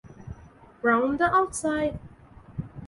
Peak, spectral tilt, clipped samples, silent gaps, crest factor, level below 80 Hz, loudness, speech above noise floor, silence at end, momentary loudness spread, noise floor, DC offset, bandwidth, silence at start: -10 dBFS; -5 dB/octave; under 0.1%; none; 18 dB; -50 dBFS; -25 LUFS; 27 dB; 0 s; 22 LU; -51 dBFS; under 0.1%; 12 kHz; 0.05 s